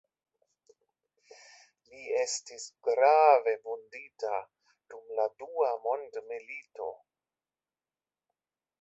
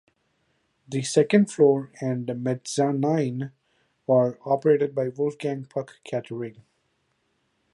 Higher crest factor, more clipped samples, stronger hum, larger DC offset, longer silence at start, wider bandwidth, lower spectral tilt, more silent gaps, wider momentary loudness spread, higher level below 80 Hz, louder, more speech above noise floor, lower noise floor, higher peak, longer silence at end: about the same, 22 dB vs 22 dB; neither; neither; neither; first, 1.95 s vs 0.9 s; second, 8.4 kHz vs 11.5 kHz; second, 0 dB/octave vs -6.5 dB/octave; neither; first, 19 LU vs 14 LU; second, -82 dBFS vs -72 dBFS; second, -30 LUFS vs -24 LUFS; first, over 60 dB vs 48 dB; first, under -90 dBFS vs -72 dBFS; second, -10 dBFS vs -4 dBFS; first, 1.85 s vs 1.25 s